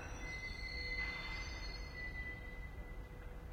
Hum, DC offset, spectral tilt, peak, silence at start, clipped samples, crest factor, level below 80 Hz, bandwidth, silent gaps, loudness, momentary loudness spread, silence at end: none; under 0.1%; -4 dB/octave; -30 dBFS; 0 s; under 0.1%; 16 dB; -50 dBFS; 16 kHz; none; -45 LUFS; 11 LU; 0 s